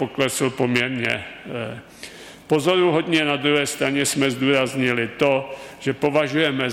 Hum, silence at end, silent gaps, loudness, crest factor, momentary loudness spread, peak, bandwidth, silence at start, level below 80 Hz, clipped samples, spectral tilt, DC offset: none; 0 s; none; -21 LUFS; 16 dB; 14 LU; -6 dBFS; 16 kHz; 0 s; -58 dBFS; under 0.1%; -4 dB/octave; under 0.1%